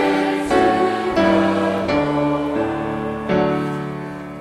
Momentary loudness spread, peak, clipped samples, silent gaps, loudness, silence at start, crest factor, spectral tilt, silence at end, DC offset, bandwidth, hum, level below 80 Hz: 9 LU; -6 dBFS; under 0.1%; none; -19 LUFS; 0 s; 12 dB; -6.5 dB/octave; 0 s; under 0.1%; 13 kHz; none; -44 dBFS